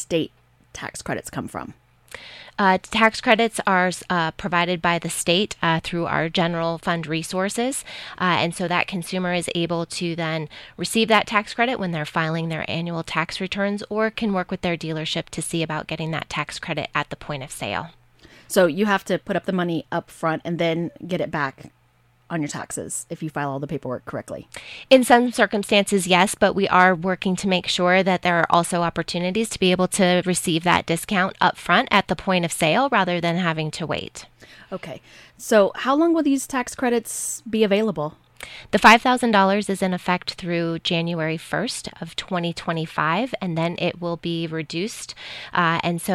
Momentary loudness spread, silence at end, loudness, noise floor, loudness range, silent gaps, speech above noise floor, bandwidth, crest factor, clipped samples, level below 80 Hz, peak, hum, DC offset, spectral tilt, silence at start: 13 LU; 0 s; -22 LUFS; -60 dBFS; 7 LU; none; 38 dB; 16 kHz; 20 dB; under 0.1%; -54 dBFS; -2 dBFS; none; under 0.1%; -4.5 dB/octave; 0 s